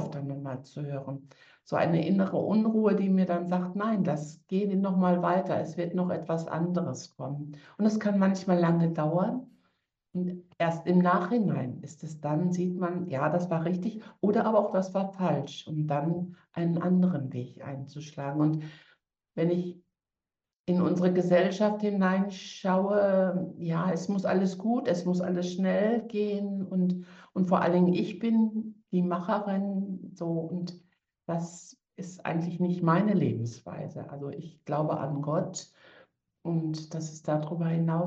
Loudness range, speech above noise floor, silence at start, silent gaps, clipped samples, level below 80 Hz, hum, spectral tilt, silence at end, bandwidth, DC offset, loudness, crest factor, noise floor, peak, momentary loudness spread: 6 LU; over 62 dB; 0 s; 20.59-20.64 s; under 0.1%; -74 dBFS; none; -8 dB/octave; 0 s; 7.8 kHz; under 0.1%; -29 LUFS; 18 dB; under -90 dBFS; -12 dBFS; 13 LU